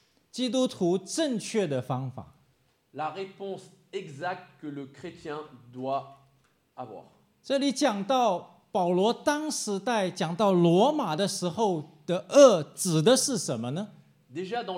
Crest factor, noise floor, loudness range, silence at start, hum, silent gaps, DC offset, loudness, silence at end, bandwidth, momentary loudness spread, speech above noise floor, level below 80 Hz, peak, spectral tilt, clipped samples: 22 dB; -68 dBFS; 15 LU; 0.35 s; none; none; under 0.1%; -26 LUFS; 0 s; 16 kHz; 19 LU; 42 dB; -76 dBFS; -6 dBFS; -4.5 dB/octave; under 0.1%